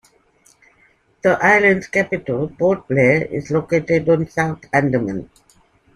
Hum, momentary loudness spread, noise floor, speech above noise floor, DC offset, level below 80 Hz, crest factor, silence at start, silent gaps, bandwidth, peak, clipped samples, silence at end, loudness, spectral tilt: none; 9 LU; -57 dBFS; 40 dB; under 0.1%; -52 dBFS; 18 dB; 1.25 s; none; 11.5 kHz; -2 dBFS; under 0.1%; 0.7 s; -17 LUFS; -7 dB/octave